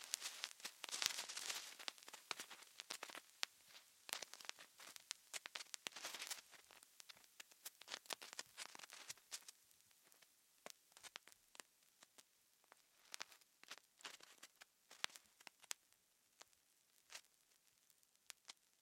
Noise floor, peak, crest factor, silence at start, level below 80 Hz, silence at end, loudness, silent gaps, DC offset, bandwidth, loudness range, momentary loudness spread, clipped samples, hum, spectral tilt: -78 dBFS; -14 dBFS; 42 dB; 0 s; under -90 dBFS; 0.3 s; -52 LUFS; none; under 0.1%; 16.5 kHz; 12 LU; 18 LU; under 0.1%; none; 2 dB/octave